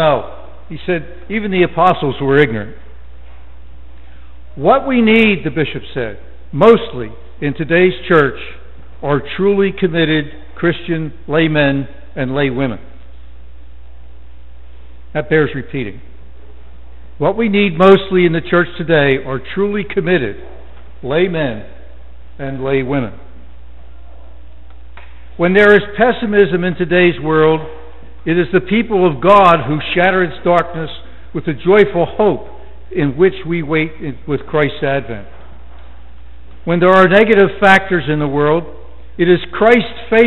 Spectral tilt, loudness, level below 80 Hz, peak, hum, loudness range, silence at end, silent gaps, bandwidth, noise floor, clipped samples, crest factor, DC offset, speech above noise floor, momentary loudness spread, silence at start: -8 dB/octave; -14 LUFS; -38 dBFS; 0 dBFS; none; 9 LU; 0 s; none; 7.8 kHz; -38 dBFS; under 0.1%; 16 dB; 4%; 25 dB; 16 LU; 0 s